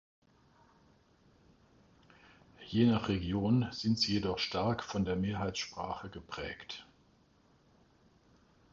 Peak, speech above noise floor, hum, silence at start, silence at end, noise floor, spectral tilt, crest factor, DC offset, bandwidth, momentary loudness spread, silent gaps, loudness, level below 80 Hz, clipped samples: -16 dBFS; 34 dB; none; 2.6 s; 1.9 s; -67 dBFS; -6 dB/octave; 22 dB; under 0.1%; 7.6 kHz; 15 LU; none; -34 LUFS; -56 dBFS; under 0.1%